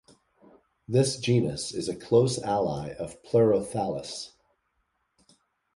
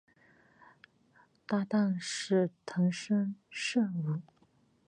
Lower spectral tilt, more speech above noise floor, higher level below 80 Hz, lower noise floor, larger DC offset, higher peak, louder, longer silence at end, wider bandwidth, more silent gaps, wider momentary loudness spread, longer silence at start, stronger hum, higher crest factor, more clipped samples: about the same, -6 dB/octave vs -5.5 dB/octave; first, 49 dB vs 37 dB; first, -58 dBFS vs -80 dBFS; first, -75 dBFS vs -68 dBFS; neither; first, -8 dBFS vs -18 dBFS; first, -27 LUFS vs -32 LUFS; first, 1.5 s vs 0.65 s; about the same, 11.5 kHz vs 11 kHz; neither; first, 14 LU vs 7 LU; second, 0.9 s vs 1.5 s; neither; about the same, 20 dB vs 16 dB; neither